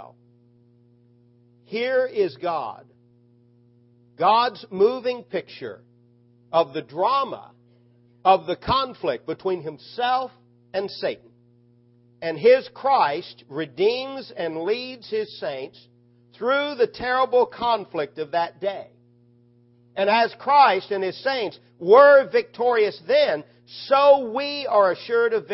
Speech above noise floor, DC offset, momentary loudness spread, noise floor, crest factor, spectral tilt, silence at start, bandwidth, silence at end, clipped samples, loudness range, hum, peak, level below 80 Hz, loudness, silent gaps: 36 dB; under 0.1%; 15 LU; -57 dBFS; 20 dB; -8 dB/octave; 0 s; 5.8 kHz; 0 s; under 0.1%; 10 LU; none; -2 dBFS; -60 dBFS; -22 LUFS; none